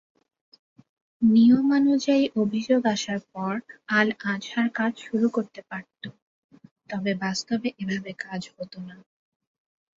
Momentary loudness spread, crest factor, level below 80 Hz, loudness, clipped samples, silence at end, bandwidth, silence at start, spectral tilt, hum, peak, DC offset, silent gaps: 19 LU; 20 dB; -68 dBFS; -24 LUFS; under 0.1%; 1.05 s; 7.6 kHz; 1.2 s; -5.5 dB/octave; none; -6 dBFS; under 0.1%; 6.22-6.49 s, 6.71-6.76 s